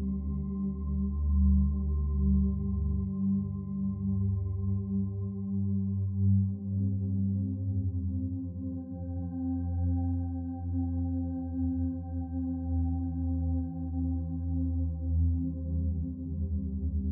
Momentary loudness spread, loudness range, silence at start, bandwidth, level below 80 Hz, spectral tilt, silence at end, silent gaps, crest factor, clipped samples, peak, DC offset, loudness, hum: 7 LU; 4 LU; 0 s; 1.1 kHz; -38 dBFS; -15.5 dB/octave; 0 s; none; 14 dB; under 0.1%; -16 dBFS; under 0.1%; -32 LUFS; none